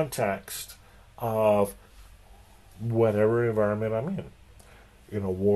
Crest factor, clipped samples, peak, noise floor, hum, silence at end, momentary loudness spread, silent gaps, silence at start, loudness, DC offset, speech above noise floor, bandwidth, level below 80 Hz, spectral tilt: 18 dB; under 0.1%; -10 dBFS; -53 dBFS; none; 0 s; 14 LU; none; 0 s; -27 LUFS; under 0.1%; 27 dB; 13 kHz; -52 dBFS; -6.5 dB/octave